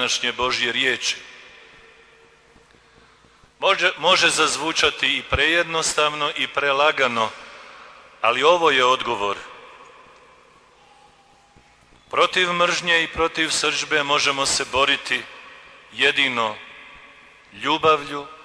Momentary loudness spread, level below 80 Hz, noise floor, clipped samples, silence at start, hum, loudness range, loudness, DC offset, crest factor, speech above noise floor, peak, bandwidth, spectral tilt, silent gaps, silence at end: 15 LU; -50 dBFS; -54 dBFS; under 0.1%; 0 s; none; 7 LU; -19 LUFS; under 0.1%; 18 dB; 34 dB; -4 dBFS; 11 kHz; -1.5 dB/octave; none; 0 s